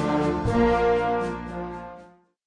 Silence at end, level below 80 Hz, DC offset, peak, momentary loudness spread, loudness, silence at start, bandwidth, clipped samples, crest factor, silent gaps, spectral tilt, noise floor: 0.4 s; -40 dBFS; under 0.1%; -8 dBFS; 16 LU; -24 LUFS; 0 s; 10.5 kHz; under 0.1%; 16 dB; none; -7.5 dB/octave; -50 dBFS